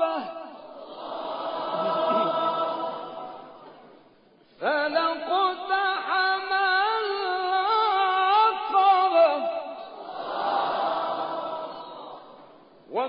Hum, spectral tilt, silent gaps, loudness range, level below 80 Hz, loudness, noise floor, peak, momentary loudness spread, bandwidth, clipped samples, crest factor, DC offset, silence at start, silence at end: none; -7 dB/octave; none; 7 LU; -76 dBFS; -24 LUFS; -58 dBFS; -10 dBFS; 19 LU; 5.2 kHz; under 0.1%; 16 dB; under 0.1%; 0 s; 0 s